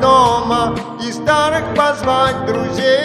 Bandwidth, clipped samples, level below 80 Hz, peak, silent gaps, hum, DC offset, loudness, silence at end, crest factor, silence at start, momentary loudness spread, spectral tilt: 13 kHz; under 0.1%; -40 dBFS; 0 dBFS; none; none; under 0.1%; -15 LUFS; 0 s; 14 dB; 0 s; 8 LU; -4.5 dB/octave